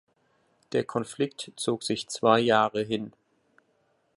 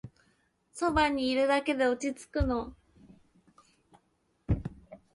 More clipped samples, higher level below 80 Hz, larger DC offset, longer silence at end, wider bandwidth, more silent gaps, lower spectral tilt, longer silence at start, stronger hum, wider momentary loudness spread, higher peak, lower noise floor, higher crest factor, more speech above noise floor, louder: neither; second, -70 dBFS vs -44 dBFS; neither; first, 1.1 s vs 0.2 s; about the same, 11.5 kHz vs 11.5 kHz; neither; about the same, -4.5 dB/octave vs -5.5 dB/octave; first, 0.7 s vs 0.05 s; neither; second, 11 LU vs 18 LU; first, -6 dBFS vs -14 dBFS; about the same, -70 dBFS vs -73 dBFS; about the same, 22 dB vs 20 dB; about the same, 44 dB vs 45 dB; about the same, -27 LUFS vs -29 LUFS